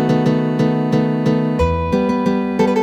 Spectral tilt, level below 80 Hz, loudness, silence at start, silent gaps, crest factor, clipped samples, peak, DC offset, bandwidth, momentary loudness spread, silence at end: -8 dB/octave; -32 dBFS; -17 LUFS; 0 s; none; 12 dB; under 0.1%; -4 dBFS; under 0.1%; 9.6 kHz; 2 LU; 0 s